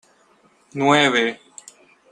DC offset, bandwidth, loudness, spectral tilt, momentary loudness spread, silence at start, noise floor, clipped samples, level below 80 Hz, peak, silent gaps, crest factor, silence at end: under 0.1%; 10.5 kHz; -18 LUFS; -4 dB/octave; 20 LU; 0.75 s; -57 dBFS; under 0.1%; -64 dBFS; -2 dBFS; none; 22 dB; 0.75 s